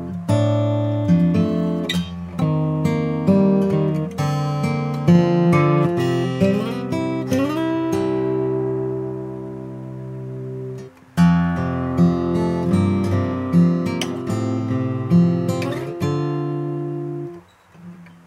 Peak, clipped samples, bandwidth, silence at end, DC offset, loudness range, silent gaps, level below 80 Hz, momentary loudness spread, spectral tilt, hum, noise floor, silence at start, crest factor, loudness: -4 dBFS; under 0.1%; 12.5 kHz; 0.15 s; under 0.1%; 5 LU; none; -50 dBFS; 14 LU; -8 dB/octave; none; -44 dBFS; 0 s; 16 dB; -20 LUFS